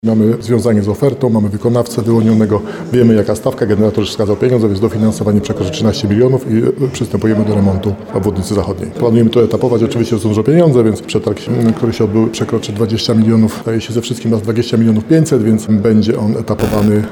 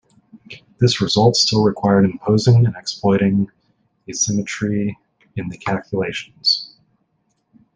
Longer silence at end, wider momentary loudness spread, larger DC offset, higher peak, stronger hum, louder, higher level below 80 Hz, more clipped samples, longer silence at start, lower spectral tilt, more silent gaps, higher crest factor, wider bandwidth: second, 0 s vs 1.1 s; second, 6 LU vs 13 LU; neither; about the same, 0 dBFS vs -2 dBFS; neither; first, -13 LUFS vs -18 LUFS; first, -42 dBFS vs -52 dBFS; neither; second, 0.05 s vs 0.35 s; first, -7 dB/octave vs -5 dB/octave; neither; about the same, 12 dB vs 16 dB; first, 17.5 kHz vs 9.8 kHz